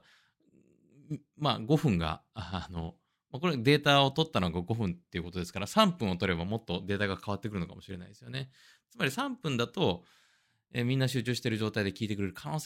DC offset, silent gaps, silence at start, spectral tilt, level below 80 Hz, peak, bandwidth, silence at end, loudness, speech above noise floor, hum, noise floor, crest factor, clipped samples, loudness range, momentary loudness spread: under 0.1%; none; 1.1 s; -5.5 dB/octave; -60 dBFS; -8 dBFS; 16 kHz; 0 s; -31 LUFS; 39 dB; none; -70 dBFS; 24 dB; under 0.1%; 7 LU; 15 LU